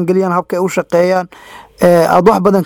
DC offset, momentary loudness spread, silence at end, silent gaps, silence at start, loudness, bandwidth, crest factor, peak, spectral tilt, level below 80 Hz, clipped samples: under 0.1%; 7 LU; 0 s; none; 0 s; -12 LUFS; 18.5 kHz; 12 dB; 0 dBFS; -6.5 dB/octave; -46 dBFS; 0.1%